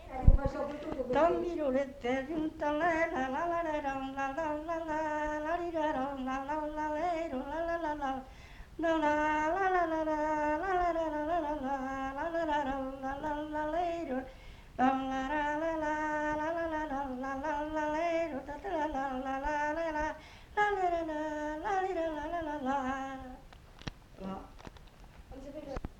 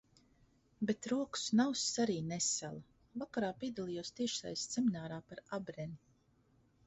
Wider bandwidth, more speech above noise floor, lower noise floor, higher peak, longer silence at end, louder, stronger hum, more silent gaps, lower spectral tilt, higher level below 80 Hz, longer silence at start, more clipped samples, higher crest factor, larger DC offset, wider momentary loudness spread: first, 11.5 kHz vs 8 kHz; second, 20 dB vs 34 dB; second, -53 dBFS vs -72 dBFS; first, -8 dBFS vs -20 dBFS; second, 0 s vs 0.9 s; first, -34 LUFS vs -38 LUFS; neither; neither; first, -6.5 dB/octave vs -4.5 dB/octave; first, -42 dBFS vs -72 dBFS; second, 0 s vs 0.8 s; neither; first, 26 dB vs 20 dB; neither; about the same, 14 LU vs 14 LU